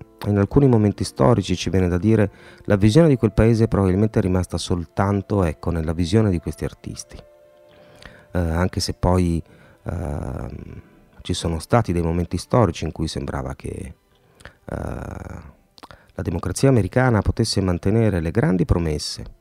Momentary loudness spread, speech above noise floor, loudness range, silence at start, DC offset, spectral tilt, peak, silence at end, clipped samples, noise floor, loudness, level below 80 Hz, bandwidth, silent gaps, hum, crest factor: 16 LU; 30 dB; 8 LU; 0.2 s; under 0.1%; -6.5 dB/octave; 0 dBFS; 0.1 s; under 0.1%; -50 dBFS; -21 LUFS; -36 dBFS; 14 kHz; none; none; 20 dB